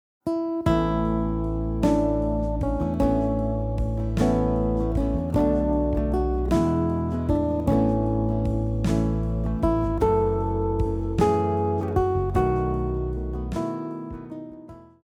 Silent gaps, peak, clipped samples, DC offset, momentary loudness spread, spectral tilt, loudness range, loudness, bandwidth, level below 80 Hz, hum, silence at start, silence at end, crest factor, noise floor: none; -10 dBFS; under 0.1%; under 0.1%; 7 LU; -9 dB/octave; 1 LU; -24 LUFS; 11.5 kHz; -30 dBFS; none; 0.25 s; 0.2 s; 14 dB; -44 dBFS